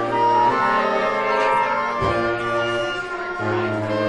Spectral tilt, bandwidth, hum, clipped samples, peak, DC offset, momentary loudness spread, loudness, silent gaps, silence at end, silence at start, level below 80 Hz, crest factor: -5.5 dB/octave; 11.5 kHz; none; under 0.1%; -6 dBFS; under 0.1%; 7 LU; -20 LUFS; none; 0 s; 0 s; -48 dBFS; 14 dB